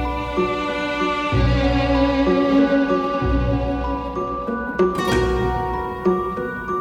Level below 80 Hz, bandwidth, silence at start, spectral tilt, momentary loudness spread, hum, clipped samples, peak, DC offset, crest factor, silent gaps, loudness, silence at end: -28 dBFS; 13.5 kHz; 0 s; -7 dB/octave; 8 LU; none; under 0.1%; -6 dBFS; under 0.1%; 14 dB; none; -20 LUFS; 0 s